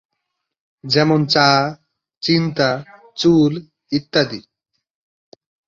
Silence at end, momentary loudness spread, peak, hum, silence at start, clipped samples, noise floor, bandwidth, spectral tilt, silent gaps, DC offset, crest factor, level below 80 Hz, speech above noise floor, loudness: 1.3 s; 15 LU; -2 dBFS; none; 0.85 s; under 0.1%; -77 dBFS; 7.4 kHz; -5.5 dB/octave; 2.17-2.21 s; under 0.1%; 18 dB; -56 dBFS; 61 dB; -17 LUFS